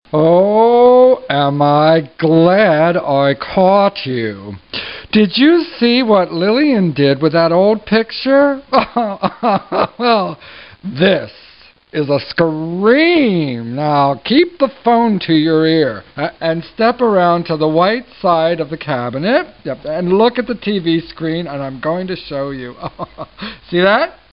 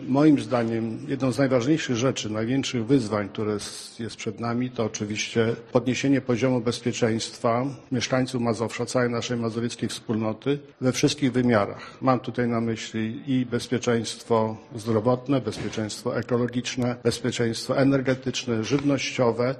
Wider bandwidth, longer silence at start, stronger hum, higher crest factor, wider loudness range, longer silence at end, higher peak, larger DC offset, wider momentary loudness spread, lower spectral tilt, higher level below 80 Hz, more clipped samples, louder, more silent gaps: second, 5.6 kHz vs 13 kHz; first, 0.15 s vs 0 s; neither; second, 14 dB vs 20 dB; first, 5 LU vs 2 LU; first, 0.2 s vs 0 s; first, 0 dBFS vs -4 dBFS; first, 0.3% vs under 0.1%; first, 13 LU vs 7 LU; first, -11 dB/octave vs -5.5 dB/octave; first, -50 dBFS vs -58 dBFS; neither; first, -13 LUFS vs -25 LUFS; neither